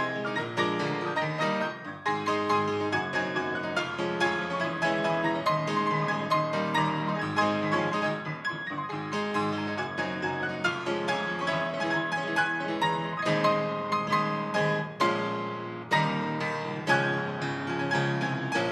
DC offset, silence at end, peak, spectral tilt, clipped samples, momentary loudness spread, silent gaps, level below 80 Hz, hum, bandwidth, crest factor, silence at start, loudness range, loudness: under 0.1%; 0 s; -12 dBFS; -5.5 dB/octave; under 0.1%; 5 LU; none; -72 dBFS; none; 12.5 kHz; 16 dB; 0 s; 2 LU; -28 LUFS